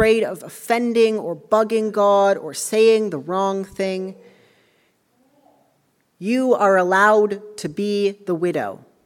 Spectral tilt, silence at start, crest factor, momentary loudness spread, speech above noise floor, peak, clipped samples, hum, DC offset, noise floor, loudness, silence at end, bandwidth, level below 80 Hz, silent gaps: -4.5 dB/octave; 0 s; 18 dB; 12 LU; 46 dB; -2 dBFS; under 0.1%; none; under 0.1%; -64 dBFS; -19 LUFS; 0.3 s; 17 kHz; -56 dBFS; none